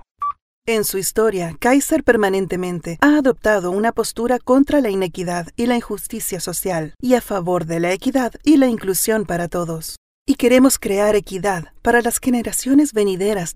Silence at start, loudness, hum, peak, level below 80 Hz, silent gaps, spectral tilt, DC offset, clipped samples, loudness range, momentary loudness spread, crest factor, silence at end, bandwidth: 0.2 s; -18 LUFS; none; 0 dBFS; -44 dBFS; 0.42-0.62 s, 9.98-10.25 s; -4.5 dB/octave; under 0.1%; under 0.1%; 3 LU; 10 LU; 18 dB; 0.05 s; 16 kHz